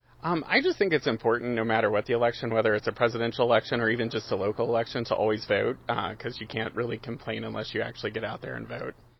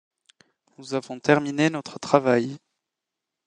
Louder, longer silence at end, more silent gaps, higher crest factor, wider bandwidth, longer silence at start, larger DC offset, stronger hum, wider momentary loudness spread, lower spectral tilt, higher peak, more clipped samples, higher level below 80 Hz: second, -28 LUFS vs -23 LUFS; second, 0.25 s vs 0.9 s; neither; about the same, 20 dB vs 24 dB; second, 6.2 kHz vs 10 kHz; second, 0.25 s vs 0.8 s; neither; neither; second, 10 LU vs 14 LU; about the same, -6.5 dB/octave vs -5.5 dB/octave; second, -6 dBFS vs 0 dBFS; neither; first, -58 dBFS vs -70 dBFS